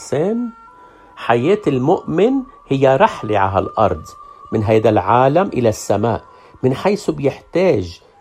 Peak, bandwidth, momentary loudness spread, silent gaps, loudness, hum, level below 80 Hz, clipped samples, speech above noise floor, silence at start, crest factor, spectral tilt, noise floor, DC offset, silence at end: 0 dBFS; 15 kHz; 10 LU; none; -16 LUFS; none; -48 dBFS; under 0.1%; 28 dB; 0 s; 16 dB; -6.5 dB/octave; -43 dBFS; under 0.1%; 0.25 s